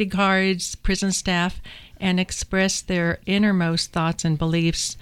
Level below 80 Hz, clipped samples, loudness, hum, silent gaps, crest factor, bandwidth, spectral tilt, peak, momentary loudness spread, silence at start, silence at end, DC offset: -38 dBFS; under 0.1%; -22 LUFS; none; none; 14 dB; 14.5 kHz; -4.5 dB/octave; -8 dBFS; 6 LU; 0 s; 0 s; under 0.1%